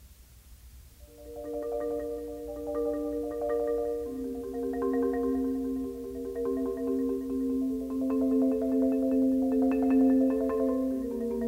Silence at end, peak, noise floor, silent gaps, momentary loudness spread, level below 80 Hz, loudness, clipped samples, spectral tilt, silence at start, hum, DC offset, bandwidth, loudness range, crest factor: 0 s; -16 dBFS; -53 dBFS; none; 11 LU; -52 dBFS; -30 LUFS; under 0.1%; -7.5 dB/octave; 0 s; 60 Hz at -55 dBFS; under 0.1%; 16 kHz; 7 LU; 14 dB